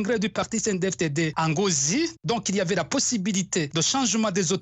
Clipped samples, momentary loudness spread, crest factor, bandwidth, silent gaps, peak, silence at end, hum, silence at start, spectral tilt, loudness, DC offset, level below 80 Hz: under 0.1%; 4 LU; 14 dB; 9.6 kHz; none; -10 dBFS; 0 s; none; 0 s; -3.5 dB/octave; -24 LUFS; under 0.1%; -58 dBFS